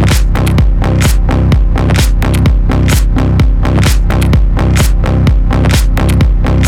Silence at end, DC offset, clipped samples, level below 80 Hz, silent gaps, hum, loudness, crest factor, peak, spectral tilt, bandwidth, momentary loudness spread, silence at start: 0 s; under 0.1%; under 0.1%; -10 dBFS; none; none; -11 LUFS; 8 dB; 0 dBFS; -6 dB/octave; 16.5 kHz; 1 LU; 0 s